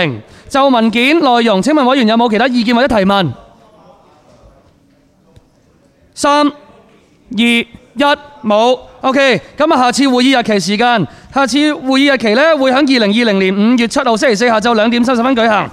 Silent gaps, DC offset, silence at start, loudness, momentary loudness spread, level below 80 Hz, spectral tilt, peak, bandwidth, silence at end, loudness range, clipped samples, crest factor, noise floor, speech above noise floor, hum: none; under 0.1%; 0 s; -11 LUFS; 5 LU; -46 dBFS; -4.5 dB/octave; 0 dBFS; 14 kHz; 0 s; 9 LU; under 0.1%; 12 dB; -50 dBFS; 39 dB; none